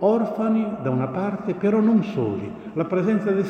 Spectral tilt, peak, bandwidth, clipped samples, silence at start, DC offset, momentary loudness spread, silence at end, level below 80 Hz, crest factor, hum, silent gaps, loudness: -9.5 dB/octave; -6 dBFS; 6.6 kHz; under 0.1%; 0 s; under 0.1%; 8 LU; 0 s; -60 dBFS; 14 dB; none; none; -23 LUFS